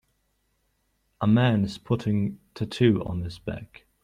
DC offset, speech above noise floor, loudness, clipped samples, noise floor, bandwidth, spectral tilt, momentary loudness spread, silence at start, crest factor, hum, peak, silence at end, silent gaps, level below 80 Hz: under 0.1%; 47 dB; -25 LUFS; under 0.1%; -72 dBFS; 10.5 kHz; -8 dB/octave; 14 LU; 1.2 s; 20 dB; none; -8 dBFS; 0.4 s; none; -54 dBFS